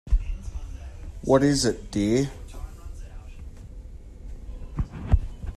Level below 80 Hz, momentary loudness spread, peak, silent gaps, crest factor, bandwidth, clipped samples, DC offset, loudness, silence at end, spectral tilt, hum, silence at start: -32 dBFS; 23 LU; -6 dBFS; none; 20 dB; 13 kHz; under 0.1%; under 0.1%; -25 LUFS; 0.05 s; -5.5 dB/octave; none; 0.05 s